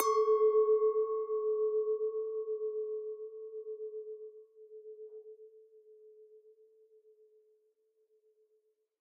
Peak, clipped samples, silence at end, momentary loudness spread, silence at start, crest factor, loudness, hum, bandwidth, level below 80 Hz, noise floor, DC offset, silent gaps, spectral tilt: -12 dBFS; under 0.1%; 2.65 s; 24 LU; 0 s; 24 dB; -33 LUFS; none; 5.4 kHz; under -90 dBFS; -76 dBFS; under 0.1%; none; 0 dB/octave